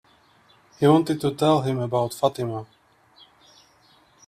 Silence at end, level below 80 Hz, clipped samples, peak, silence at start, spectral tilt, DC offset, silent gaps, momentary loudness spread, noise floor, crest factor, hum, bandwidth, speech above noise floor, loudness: 1.65 s; -62 dBFS; under 0.1%; -4 dBFS; 0.8 s; -7 dB/octave; under 0.1%; none; 12 LU; -58 dBFS; 20 dB; none; 15 kHz; 36 dB; -22 LUFS